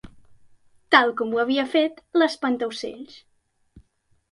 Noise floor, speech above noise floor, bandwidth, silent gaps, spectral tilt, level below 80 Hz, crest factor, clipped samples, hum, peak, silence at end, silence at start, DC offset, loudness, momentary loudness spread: -66 dBFS; 44 dB; 11.5 kHz; none; -3.5 dB/octave; -62 dBFS; 22 dB; under 0.1%; none; -4 dBFS; 0.5 s; 0.9 s; under 0.1%; -22 LUFS; 16 LU